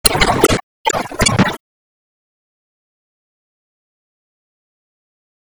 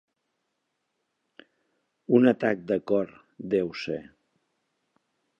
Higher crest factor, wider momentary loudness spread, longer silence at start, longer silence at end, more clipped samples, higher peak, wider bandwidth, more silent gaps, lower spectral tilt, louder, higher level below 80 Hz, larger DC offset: about the same, 20 dB vs 22 dB; second, 7 LU vs 17 LU; second, 0.05 s vs 2.1 s; first, 4 s vs 1.35 s; first, 0.1% vs under 0.1%; first, 0 dBFS vs -6 dBFS; first, over 20 kHz vs 6.8 kHz; first, 0.63-0.85 s vs none; second, -3 dB/octave vs -7.5 dB/octave; first, -15 LUFS vs -26 LUFS; first, -34 dBFS vs -68 dBFS; neither